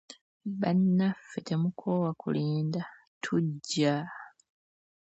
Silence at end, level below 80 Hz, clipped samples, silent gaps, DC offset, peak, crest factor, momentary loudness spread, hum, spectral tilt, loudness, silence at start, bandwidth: 0.8 s; -74 dBFS; under 0.1%; 0.21-0.40 s, 3.07-3.21 s; under 0.1%; -14 dBFS; 18 dB; 14 LU; none; -6.5 dB/octave; -30 LUFS; 0.1 s; 8.2 kHz